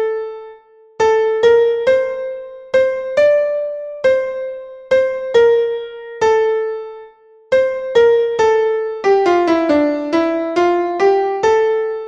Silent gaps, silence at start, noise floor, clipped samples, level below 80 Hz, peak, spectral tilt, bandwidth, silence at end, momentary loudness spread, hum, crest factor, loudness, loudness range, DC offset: none; 0 s; -43 dBFS; under 0.1%; -54 dBFS; -2 dBFS; -4.5 dB/octave; 7.8 kHz; 0 s; 12 LU; none; 14 dB; -15 LUFS; 3 LU; under 0.1%